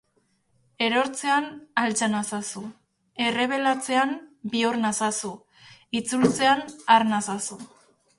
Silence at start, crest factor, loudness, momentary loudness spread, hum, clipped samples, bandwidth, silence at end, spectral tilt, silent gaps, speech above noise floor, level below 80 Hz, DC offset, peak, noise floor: 0.8 s; 20 dB; -24 LUFS; 14 LU; none; under 0.1%; 11.5 kHz; 0.55 s; -3 dB/octave; none; 45 dB; -66 dBFS; under 0.1%; -6 dBFS; -69 dBFS